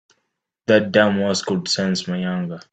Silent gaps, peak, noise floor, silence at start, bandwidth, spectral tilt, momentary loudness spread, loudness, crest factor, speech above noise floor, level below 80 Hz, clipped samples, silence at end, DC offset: none; -2 dBFS; -75 dBFS; 0.7 s; 9 kHz; -4.5 dB/octave; 9 LU; -19 LUFS; 18 dB; 55 dB; -62 dBFS; under 0.1%; 0.15 s; under 0.1%